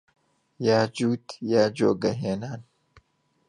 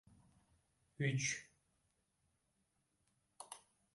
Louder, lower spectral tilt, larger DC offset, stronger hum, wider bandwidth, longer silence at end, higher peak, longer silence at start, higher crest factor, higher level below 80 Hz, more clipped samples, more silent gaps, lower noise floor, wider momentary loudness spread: first, -25 LUFS vs -40 LUFS; first, -6 dB/octave vs -3.5 dB/octave; neither; neither; about the same, 11 kHz vs 11.5 kHz; first, 0.85 s vs 0.35 s; first, -6 dBFS vs -24 dBFS; second, 0.6 s vs 1 s; about the same, 20 dB vs 24 dB; first, -64 dBFS vs -80 dBFS; neither; neither; second, -64 dBFS vs -83 dBFS; second, 10 LU vs 19 LU